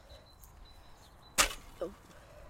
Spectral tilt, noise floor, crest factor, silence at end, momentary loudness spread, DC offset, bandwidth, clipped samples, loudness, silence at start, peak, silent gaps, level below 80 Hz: -0.5 dB/octave; -56 dBFS; 32 dB; 0 s; 26 LU; under 0.1%; 16 kHz; under 0.1%; -33 LUFS; 0.1 s; -8 dBFS; none; -52 dBFS